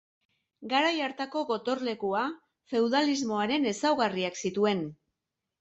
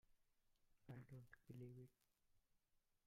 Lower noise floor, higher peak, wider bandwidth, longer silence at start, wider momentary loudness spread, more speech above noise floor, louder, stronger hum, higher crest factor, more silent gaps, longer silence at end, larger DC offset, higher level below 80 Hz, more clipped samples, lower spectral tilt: about the same, -86 dBFS vs -85 dBFS; first, -14 dBFS vs -46 dBFS; second, 8.4 kHz vs 15.5 kHz; first, 0.6 s vs 0.05 s; about the same, 7 LU vs 5 LU; first, 58 dB vs 23 dB; first, -29 LUFS vs -62 LUFS; neither; about the same, 16 dB vs 18 dB; neither; first, 0.65 s vs 0.1 s; neither; first, -74 dBFS vs -84 dBFS; neither; second, -4 dB/octave vs -8 dB/octave